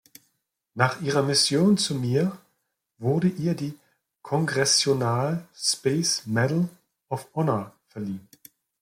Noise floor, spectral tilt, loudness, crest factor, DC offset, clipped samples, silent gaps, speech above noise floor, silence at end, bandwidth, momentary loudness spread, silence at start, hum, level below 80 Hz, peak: -75 dBFS; -4.5 dB/octave; -24 LUFS; 20 dB; under 0.1%; under 0.1%; none; 51 dB; 0.6 s; 16.5 kHz; 15 LU; 0.75 s; none; -66 dBFS; -6 dBFS